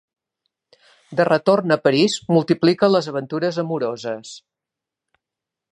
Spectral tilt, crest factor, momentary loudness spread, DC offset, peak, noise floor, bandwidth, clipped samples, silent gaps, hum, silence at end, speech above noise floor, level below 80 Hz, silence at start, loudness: -5.5 dB/octave; 18 dB; 12 LU; under 0.1%; -2 dBFS; -86 dBFS; 10.5 kHz; under 0.1%; none; none; 1.35 s; 67 dB; -70 dBFS; 1.1 s; -19 LUFS